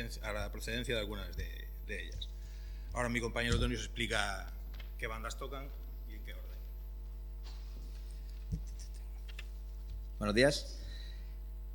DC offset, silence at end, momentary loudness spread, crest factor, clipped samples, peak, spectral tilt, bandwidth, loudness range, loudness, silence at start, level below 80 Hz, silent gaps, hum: under 0.1%; 0 s; 14 LU; 24 dB; under 0.1%; -14 dBFS; -4.5 dB/octave; 19 kHz; 9 LU; -40 LUFS; 0 s; -42 dBFS; none; none